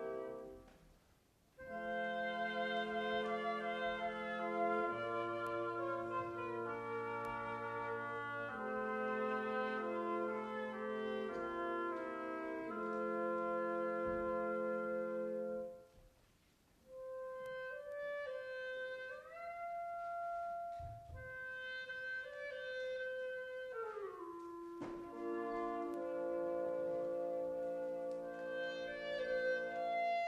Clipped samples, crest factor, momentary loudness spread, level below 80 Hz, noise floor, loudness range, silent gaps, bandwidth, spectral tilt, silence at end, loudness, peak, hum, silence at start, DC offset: under 0.1%; 16 dB; 9 LU; -72 dBFS; -72 dBFS; 6 LU; none; 13 kHz; -6 dB/octave; 0 s; -42 LUFS; -26 dBFS; none; 0 s; under 0.1%